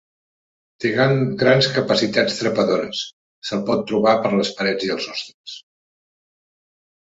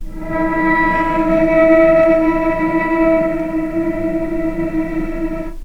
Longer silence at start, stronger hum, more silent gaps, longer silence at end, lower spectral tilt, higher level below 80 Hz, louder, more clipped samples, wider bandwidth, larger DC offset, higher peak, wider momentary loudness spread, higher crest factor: first, 0.8 s vs 0 s; neither; first, 3.13-3.42 s, 5.34-5.44 s vs none; first, 1.45 s vs 0 s; second, -5 dB/octave vs -8 dB/octave; second, -60 dBFS vs -28 dBFS; second, -19 LUFS vs -15 LUFS; neither; first, 8 kHz vs 6.2 kHz; neither; about the same, -2 dBFS vs 0 dBFS; first, 16 LU vs 11 LU; first, 20 dB vs 14 dB